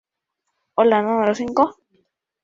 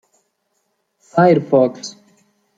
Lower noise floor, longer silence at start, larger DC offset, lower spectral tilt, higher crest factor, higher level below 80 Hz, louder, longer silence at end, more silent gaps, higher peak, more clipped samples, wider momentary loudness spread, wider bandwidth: first, -78 dBFS vs -69 dBFS; second, 0.75 s vs 1.15 s; neither; about the same, -6 dB/octave vs -7 dB/octave; about the same, 18 dB vs 18 dB; about the same, -62 dBFS vs -64 dBFS; second, -19 LUFS vs -15 LUFS; about the same, 0.7 s vs 0.65 s; neither; about the same, -4 dBFS vs -2 dBFS; neither; second, 5 LU vs 19 LU; about the same, 7.6 kHz vs 7.8 kHz